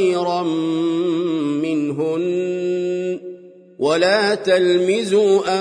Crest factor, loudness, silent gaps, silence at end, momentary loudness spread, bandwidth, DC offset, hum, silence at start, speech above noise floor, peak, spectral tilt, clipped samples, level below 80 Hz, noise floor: 14 dB; -19 LUFS; none; 0 s; 7 LU; 10.5 kHz; under 0.1%; none; 0 s; 23 dB; -4 dBFS; -5 dB/octave; under 0.1%; -68 dBFS; -40 dBFS